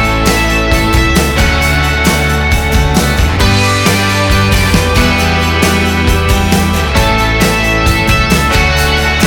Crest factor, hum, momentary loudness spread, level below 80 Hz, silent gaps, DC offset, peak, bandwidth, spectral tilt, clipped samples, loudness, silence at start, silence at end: 10 dB; none; 2 LU; -16 dBFS; none; under 0.1%; 0 dBFS; 19 kHz; -4.5 dB/octave; under 0.1%; -10 LUFS; 0 s; 0 s